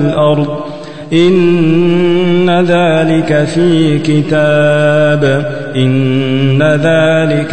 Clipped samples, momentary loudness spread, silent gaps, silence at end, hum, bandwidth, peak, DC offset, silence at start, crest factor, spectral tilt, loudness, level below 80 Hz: under 0.1%; 5 LU; none; 0 s; none; 9 kHz; 0 dBFS; 4%; 0 s; 10 dB; -7 dB/octave; -10 LUFS; -44 dBFS